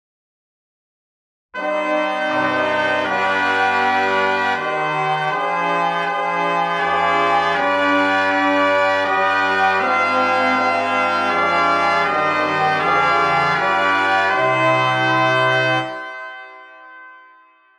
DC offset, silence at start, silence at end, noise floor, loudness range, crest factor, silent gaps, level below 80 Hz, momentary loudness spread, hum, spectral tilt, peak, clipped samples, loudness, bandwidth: under 0.1%; 1.55 s; 0.6 s; -51 dBFS; 3 LU; 14 dB; none; -62 dBFS; 4 LU; none; -4.5 dB/octave; -4 dBFS; under 0.1%; -17 LUFS; 12.5 kHz